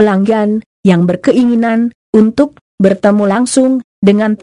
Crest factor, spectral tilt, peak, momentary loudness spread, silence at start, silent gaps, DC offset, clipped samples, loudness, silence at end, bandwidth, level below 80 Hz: 10 dB; -6.5 dB/octave; 0 dBFS; 4 LU; 0 s; 0.66-0.83 s, 1.95-2.13 s, 2.61-2.78 s, 3.84-4.02 s; under 0.1%; 0.3%; -11 LUFS; 0.05 s; 11 kHz; -48 dBFS